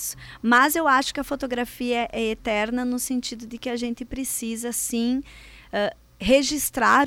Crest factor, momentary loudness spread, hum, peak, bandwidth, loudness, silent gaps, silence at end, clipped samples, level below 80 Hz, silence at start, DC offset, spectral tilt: 16 dB; 12 LU; none; -8 dBFS; 17 kHz; -24 LUFS; none; 0 s; under 0.1%; -48 dBFS; 0 s; under 0.1%; -2.5 dB/octave